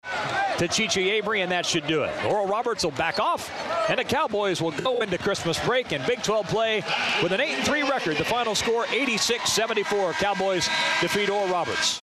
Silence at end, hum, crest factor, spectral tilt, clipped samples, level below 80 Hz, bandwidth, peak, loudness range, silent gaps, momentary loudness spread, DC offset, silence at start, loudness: 0 s; none; 16 dB; -3 dB/octave; under 0.1%; -56 dBFS; 14.5 kHz; -10 dBFS; 2 LU; none; 3 LU; under 0.1%; 0.05 s; -24 LUFS